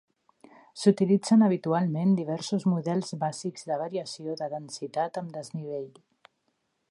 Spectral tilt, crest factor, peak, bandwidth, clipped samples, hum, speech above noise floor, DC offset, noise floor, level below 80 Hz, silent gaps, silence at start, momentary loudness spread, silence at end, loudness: -6.5 dB/octave; 20 dB; -8 dBFS; 11.5 kHz; under 0.1%; none; 49 dB; under 0.1%; -76 dBFS; -78 dBFS; none; 0.75 s; 15 LU; 1 s; -28 LUFS